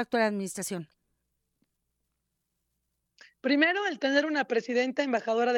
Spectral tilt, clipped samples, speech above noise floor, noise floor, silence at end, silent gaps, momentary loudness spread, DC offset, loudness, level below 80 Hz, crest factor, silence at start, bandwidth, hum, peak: -4 dB/octave; under 0.1%; 54 dB; -81 dBFS; 0 s; none; 11 LU; under 0.1%; -28 LUFS; -80 dBFS; 20 dB; 0 s; 17 kHz; none; -10 dBFS